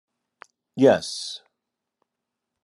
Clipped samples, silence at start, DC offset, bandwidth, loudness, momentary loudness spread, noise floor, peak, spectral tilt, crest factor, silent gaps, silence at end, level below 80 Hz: under 0.1%; 0.75 s; under 0.1%; 12 kHz; -21 LUFS; 21 LU; -83 dBFS; -4 dBFS; -5 dB/octave; 22 dB; none; 1.25 s; -72 dBFS